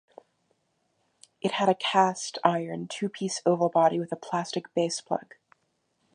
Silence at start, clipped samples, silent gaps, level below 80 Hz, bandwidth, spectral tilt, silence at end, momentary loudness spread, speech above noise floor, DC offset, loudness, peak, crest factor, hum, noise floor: 1.45 s; under 0.1%; none; -80 dBFS; 10.5 kHz; -4.5 dB/octave; 0.95 s; 10 LU; 48 dB; under 0.1%; -27 LUFS; -4 dBFS; 24 dB; none; -74 dBFS